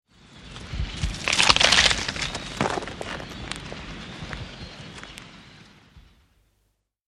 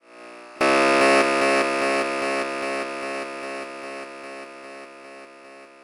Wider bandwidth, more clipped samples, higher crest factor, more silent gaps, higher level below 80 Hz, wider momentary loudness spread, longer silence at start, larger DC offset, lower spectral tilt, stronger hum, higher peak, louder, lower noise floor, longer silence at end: about the same, 13 kHz vs 12 kHz; neither; first, 28 dB vs 16 dB; neither; first, -40 dBFS vs -64 dBFS; about the same, 24 LU vs 24 LU; first, 0.3 s vs 0.1 s; neither; about the same, -2 dB/octave vs -3 dB/octave; neither; first, 0 dBFS vs -8 dBFS; about the same, -22 LUFS vs -21 LUFS; first, -71 dBFS vs -45 dBFS; first, 1.1 s vs 0.15 s